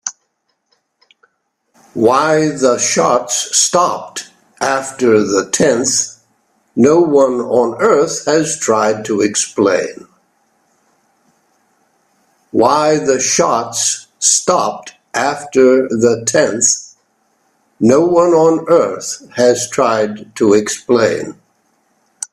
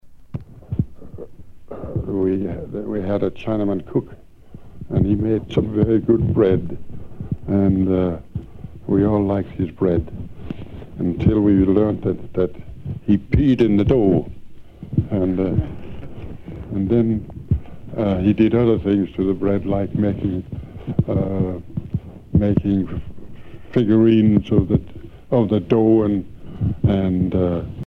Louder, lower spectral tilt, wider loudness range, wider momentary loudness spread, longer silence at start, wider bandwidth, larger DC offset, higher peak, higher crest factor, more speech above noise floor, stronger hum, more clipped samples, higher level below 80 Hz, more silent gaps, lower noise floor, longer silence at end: first, -13 LUFS vs -20 LUFS; second, -3 dB/octave vs -10.5 dB/octave; about the same, 4 LU vs 5 LU; second, 10 LU vs 19 LU; about the same, 0.05 s vs 0.05 s; first, 14.5 kHz vs 6 kHz; neither; about the same, 0 dBFS vs -2 dBFS; about the same, 14 dB vs 18 dB; first, 54 dB vs 22 dB; neither; neither; second, -58 dBFS vs -36 dBFS; neither; first, -67 dBFS vs -40 dBFS; about the same, 0.1 s vs 0 s